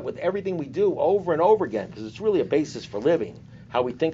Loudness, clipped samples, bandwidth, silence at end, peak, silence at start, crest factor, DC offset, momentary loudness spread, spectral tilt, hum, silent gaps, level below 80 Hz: -24 LUFS; under 0.1%; 7.8 kHz; 0 s; -8 dBFS; 0 s; 16 dB; under 0.1%; 10 LU; -5.5 dB/octave; none; none; -60 dBFS